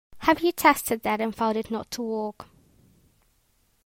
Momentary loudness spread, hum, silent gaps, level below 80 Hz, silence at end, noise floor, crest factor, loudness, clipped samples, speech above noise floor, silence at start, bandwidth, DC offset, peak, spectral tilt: 11 LU; none; none; -58 dBFS; 1.45 s; -67 dBFS; 22 dB; -25 LUFS; under 0.1%; 42 dB; 0.1 s; 16.5 kHz; under 0.1%; -4 dBFS; -3.5 dB/octave